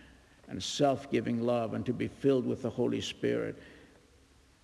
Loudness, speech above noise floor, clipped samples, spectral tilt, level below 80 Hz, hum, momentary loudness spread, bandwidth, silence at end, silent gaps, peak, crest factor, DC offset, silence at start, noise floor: -32 LUFS; 31 dB; under 0.1%; -5.5 dB/octave; -64 dBFS; none; 9 LU; 12 kHz; 0.85 s; none; -14 dBFS; 18 dB; under 0.1%; 0.05 s; -62 dBFS